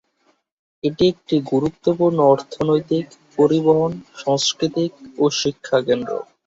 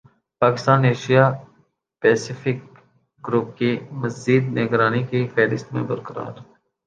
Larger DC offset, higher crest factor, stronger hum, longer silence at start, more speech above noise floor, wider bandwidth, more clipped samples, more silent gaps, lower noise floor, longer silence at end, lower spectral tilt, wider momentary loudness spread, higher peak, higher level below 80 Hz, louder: neither; about the same, 16 dB vs 20 dB; neither; first, 0.85 s vs 0.4 s; first, 45 dB vs 41 dB; second, 7.8 kHz vs 9 kHz; neither; neither; about the same, -64 dBFS vs -61 dBFS; second, 0.25 s vs 0.45 s; second, -5.5 dB/octave vs -7 dB/octave; second, 9 LU vs 13 LU; about the same, -2 dBFS vs -2 dBFS; first, -56 dBFS vs -62 dBFS; about the same, -19 LUFS vs -20 LUFS